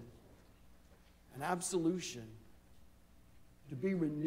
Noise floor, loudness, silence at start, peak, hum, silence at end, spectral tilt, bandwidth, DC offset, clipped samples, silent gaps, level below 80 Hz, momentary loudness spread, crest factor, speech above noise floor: -64 dBFS; -39 LUFS; 0 s; -22 dBFS; none; 0 s; -5 dB/octave; 16 kHz; under 0.1%; under 0.1%; none; -66 dBFS; 21 LU; 18 dB; 26 dB